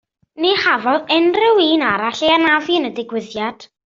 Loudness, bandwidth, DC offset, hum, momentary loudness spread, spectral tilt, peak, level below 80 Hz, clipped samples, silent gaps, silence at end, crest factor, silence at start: -16 LUFS; 7.4 kHz; under 0.1%; none; 11 LU; -4 dB/octave; -2 dBFS; -58 dBFS; under 0.1%; none; 0.3 s; 14 dB; 0.35 s